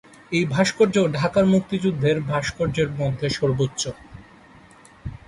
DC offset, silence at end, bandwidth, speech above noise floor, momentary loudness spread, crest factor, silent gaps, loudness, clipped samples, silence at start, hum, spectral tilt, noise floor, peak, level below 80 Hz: under 0.1%; 0.1 s; 11.5 kHz; 28 dB; 10 LU; 16 dB; none; -22 LUFS; under 0.1%; 0.3 s; none; -5.5 dB/octave; -49 dBFS; -6 dBFS; -48 dBFS